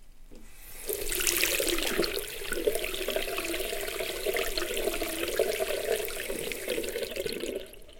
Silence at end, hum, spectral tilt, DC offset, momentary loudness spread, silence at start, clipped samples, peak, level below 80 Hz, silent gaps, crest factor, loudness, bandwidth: 0 s; none; -1.5 dB/octave; under 0.1%; 8 LU; 0 s; under 0.1%; -8 dBFS; -44 dBFS; none; 24 dB; -30 LUFS; 17 kHz